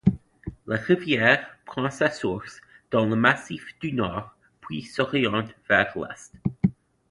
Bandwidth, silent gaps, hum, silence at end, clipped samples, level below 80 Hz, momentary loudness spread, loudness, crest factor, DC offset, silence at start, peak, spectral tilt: 11.5 kHz; none; none; 0.4 s; under 0.1%; -50 dBFS; 16 LU; -24 LUFS; 22 dB; under 0.1%; 0.05 s; -4 dBFS; -6 dB/octave